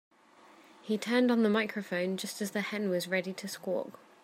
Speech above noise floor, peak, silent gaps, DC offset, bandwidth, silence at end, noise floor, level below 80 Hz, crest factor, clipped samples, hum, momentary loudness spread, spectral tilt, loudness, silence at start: 28 dB; -14 dBFS; none; under 0.1%; 16 kHz; 0.3 s; -59 dBFS; -82 dBFS; 18 dB; under 0.1%; none; 11 LU; -5 dB/octave; -32 LUFS; 0.85 s